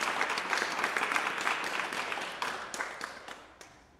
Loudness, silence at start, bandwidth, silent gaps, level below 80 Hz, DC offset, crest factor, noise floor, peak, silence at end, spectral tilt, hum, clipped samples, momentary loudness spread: -32 LUFS; 0 s; 16 kHz; none; -72 dBFS; under 0.1%; 24 dB; -55 dBFS; -10 dBFS; 0.15 s; -1 dB/octave; none; under 0.1%; 14 LU